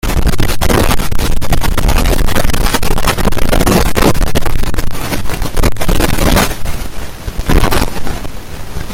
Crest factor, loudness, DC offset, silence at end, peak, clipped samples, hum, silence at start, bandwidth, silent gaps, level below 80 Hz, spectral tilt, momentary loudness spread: 8 dB; -15 LUFS; under 0.1%; 0 s; 0 dBFS; under 0.1%; none; 0.05 s; 17 kHz; none; -14 dBFS; -4.5 dB/octave; 12 LU